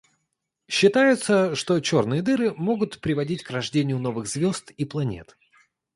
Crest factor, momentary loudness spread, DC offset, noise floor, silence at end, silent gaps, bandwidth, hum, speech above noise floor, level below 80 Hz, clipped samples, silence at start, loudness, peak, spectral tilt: 18 dB; 10 LU; under 0.1%; -79 dBFS; 0.7 s; none; 11.5 kHz; none; 56 dB; -58 dBFS; under 0.1%; 0.7 s; -23 LUFS; -6 dBFS; -5 dB/octave